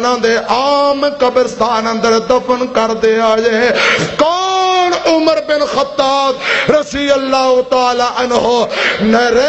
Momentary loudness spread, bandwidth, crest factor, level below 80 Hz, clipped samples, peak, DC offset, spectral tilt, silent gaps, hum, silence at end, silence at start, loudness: 2 LU; 8.4 kHz; 12 dB; -44 dBFS; under 0.1%; 0 dBFS; 0.2%; -3.5 dB/octave; none; none; 0 s; 0 s; -12 LUFS